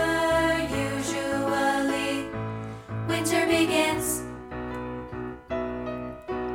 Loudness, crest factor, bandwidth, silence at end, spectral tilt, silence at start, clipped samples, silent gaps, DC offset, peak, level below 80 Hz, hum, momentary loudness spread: -27 LUFS; 16 dB; 17.5 kHz; 0 s; -4 dB/octave; 0 s; under 0.1%; none; under 0.1%; -10 dBFS; -48 dBFS; none; 13 LU